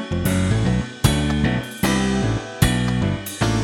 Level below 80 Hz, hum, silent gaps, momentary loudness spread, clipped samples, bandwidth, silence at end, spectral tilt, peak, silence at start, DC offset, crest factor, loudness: -30 dBFS; none; none; 4 LU; under 0.1%; 18.5 kHz; 0 s; -5.5 dB/octave; -2 dBFS; 0 s; under 0.1%; 18 dB; -21 LUFS